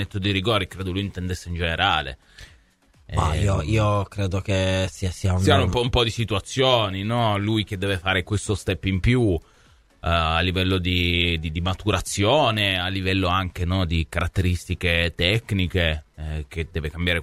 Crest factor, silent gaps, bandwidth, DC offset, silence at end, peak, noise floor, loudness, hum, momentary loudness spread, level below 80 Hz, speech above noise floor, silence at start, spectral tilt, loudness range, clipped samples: 20 dB; none; 14.5 kHz; under 0.1%; 0 s; -2 dBFS; -57 dBFS; -23 LUFS; none; 8 LU; -36 dBFS; 35 dB; 0 s; -5 dB/octave; 3 LU; under 0.1%